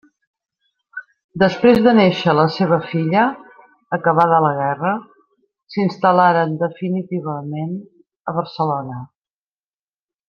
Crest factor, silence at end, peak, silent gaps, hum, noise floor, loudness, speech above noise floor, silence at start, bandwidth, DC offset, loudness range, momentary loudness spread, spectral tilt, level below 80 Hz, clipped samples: 18 dB; 1.25 s; -2 dBFS; 1.24-1.29 s, 8.16-8.25 s; none; under -90 dBFS; -17 LUFS; over 74 dB; 0.95 s; 7 kHz; under 0.1%; 9 LU; 18 LU; -8 dB/octave; -58 dBFS; under 0.1%